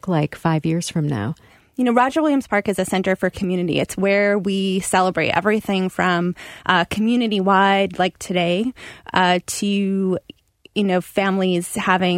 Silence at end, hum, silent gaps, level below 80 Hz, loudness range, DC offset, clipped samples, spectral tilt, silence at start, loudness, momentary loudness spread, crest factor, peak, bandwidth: 0 s; none; none; -52 dBFS; 2 LU; under 0.1%; under 0.1%; -5 dB/octave; 0.05 s; -19 LUFS; 6 LU; 18 dB; -2 dBFS; 16 kHz